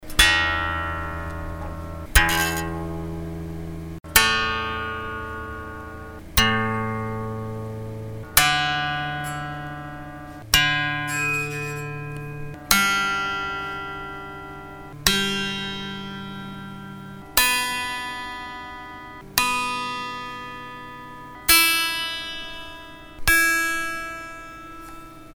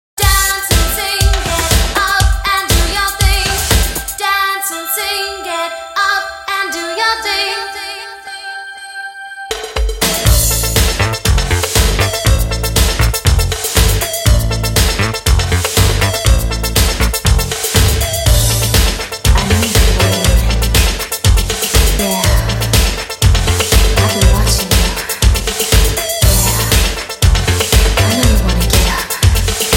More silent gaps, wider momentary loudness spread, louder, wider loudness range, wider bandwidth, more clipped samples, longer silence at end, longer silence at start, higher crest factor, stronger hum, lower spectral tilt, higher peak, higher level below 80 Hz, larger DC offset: neither; first, 20 LU vs 6 LU; second, -22 LUFS vs -13 LUFS; about the same, 5 LU vs 4 LU; first, over 20 kHz vs 17 kHz; neither; about the same, 0 s vs 0 s; second, 0 s vs 0.15 s; first, 26 dB vs 12 dB; neither; about the same, -2 dB/octave vs -3 dB/octave; about the same, 0 dBFS vs 0 dBFS; second, -38 dBFS vs -16 dBFS; neither